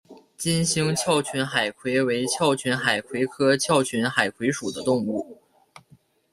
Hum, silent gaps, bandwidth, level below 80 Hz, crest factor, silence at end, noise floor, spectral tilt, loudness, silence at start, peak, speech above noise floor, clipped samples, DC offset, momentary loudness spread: none; none; 15 kHz; -62 dBFS; 22 dB; 1 s; -58 dBFS; -4 dB/octave; -23 LUFS; 0.1 s; -4 dBFS; 34 dB; under 0.1%; under 0.1%; 6 LU